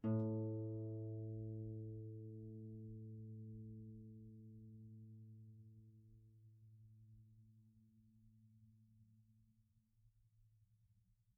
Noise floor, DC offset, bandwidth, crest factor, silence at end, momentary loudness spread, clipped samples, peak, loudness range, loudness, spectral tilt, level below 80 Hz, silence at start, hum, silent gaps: -77 dBFS; under 0.1%; 1.5 kHz; 20 dB; 0.45 s; 22 LU; under 0.1%; -30 dBFS; 19 LU; -50 LUFS; -10 dB/octave; -76 dBFS; 0 s; none; none